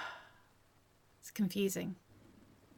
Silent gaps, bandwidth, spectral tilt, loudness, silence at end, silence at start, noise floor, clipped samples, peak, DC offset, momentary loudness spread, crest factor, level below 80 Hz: none; 17.5 kHz; -5 dB/octave; -38 LUFS; 0.35 s; 0 s; -69 dBFS; under 0.1%; -24 dBFS; under 0.1%; 20 LU; 18 dB; -74 dBFS